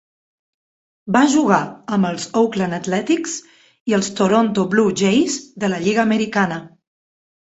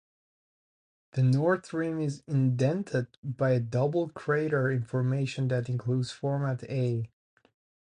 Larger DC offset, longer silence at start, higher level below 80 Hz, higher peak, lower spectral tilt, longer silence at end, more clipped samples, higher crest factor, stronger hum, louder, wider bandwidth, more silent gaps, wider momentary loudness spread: neither; about the same, 1.05 s vs 1.15 s; first, -58 dBFS vs -66 dBFS; first, -2 dBFS vs -14 dBFS; second, -5 dB/octave vs -8 dB/octave; about the same, 0.8 s vs 0.75 s; neither; about the same, 18 dB vs 16 dB; neither; first, -18 LUFS vs -29 LUFS; second, 8.2 kHz vs 10 kHz; about the same, 3.80-3.86 s vs 3.18-3.23 s; about the same, 7 LU vs 6 LU